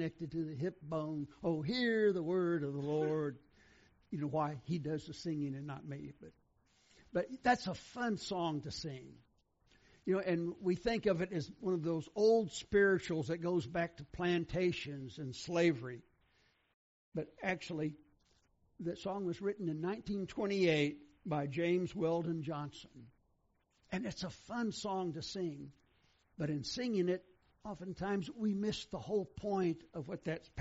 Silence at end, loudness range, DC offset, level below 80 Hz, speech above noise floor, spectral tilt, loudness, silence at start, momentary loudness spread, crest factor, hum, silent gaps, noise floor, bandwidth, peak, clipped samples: 0 s; 8 LU; under 0.1%; -66 dBFS; 40 dB; -5 dB/octave; -38 LUFS; 0 s; 12 LU; 20 dB; none; 16.74-17.12 s; -77 dBFS; 8 kHz; -18 dBFS; under 0.1%